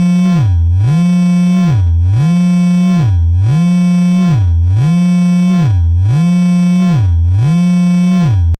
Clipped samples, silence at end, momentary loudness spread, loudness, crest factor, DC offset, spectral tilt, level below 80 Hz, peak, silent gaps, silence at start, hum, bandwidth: under 0.1%; 0.05 s; 1 LU; -10 LUFS; 6 dB; under 0.1%; -8 dB/octave; -22 dBFS; -4 dBFS; none; 0 s; none; 8.8 kHz